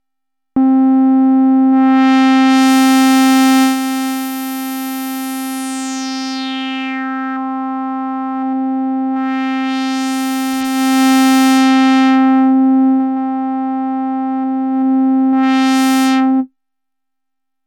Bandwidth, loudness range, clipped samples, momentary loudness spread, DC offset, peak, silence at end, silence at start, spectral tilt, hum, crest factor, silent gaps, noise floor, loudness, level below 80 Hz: 18.5 kHz; 10 LU; under 0.1%; 11 LU; under 0.1%; -6 dBFS; 1.2 s; 0.55 s; -2.5 dB/octave; none; 8 dB; none; -83 dBFS; -13 LUFS; -64 dBFS